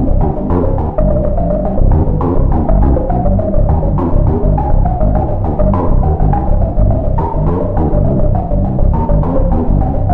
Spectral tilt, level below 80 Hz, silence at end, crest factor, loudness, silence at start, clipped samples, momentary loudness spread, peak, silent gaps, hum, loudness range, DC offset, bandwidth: -13 dB/octave; -14 dBFS; 0 s; 8 dB; -14 LUFS; 0 s; under 0.1%; 2 LU; -4 dBFS; none; none; 1 LU; under 0.1%; 2.7 kHz